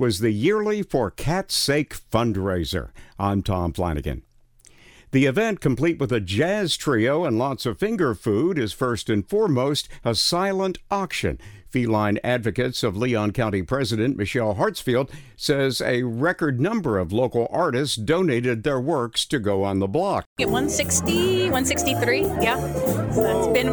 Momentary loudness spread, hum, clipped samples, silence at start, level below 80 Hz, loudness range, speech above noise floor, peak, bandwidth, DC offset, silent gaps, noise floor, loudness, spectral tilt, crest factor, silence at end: 5 LU; none; under 0.1%; 0 s; -44 dBFS; 3 LU; 31 dB; -4 dBFS; over 20 kHz; under 0.1%; 20.26-20.36 s; -53 dBFS; -23 LUFS; -5 dB/octave; 18 dB; 0 s